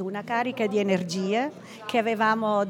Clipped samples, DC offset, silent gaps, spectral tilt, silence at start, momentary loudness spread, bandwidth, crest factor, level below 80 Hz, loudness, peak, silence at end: under 0.1%; under 0.1%; none; -5.5 dB/octave; 0 s; 5 LU; 17 kHz; 16 dB; -78 dBFS; -26 LUFS; -10 dBFS; 0 s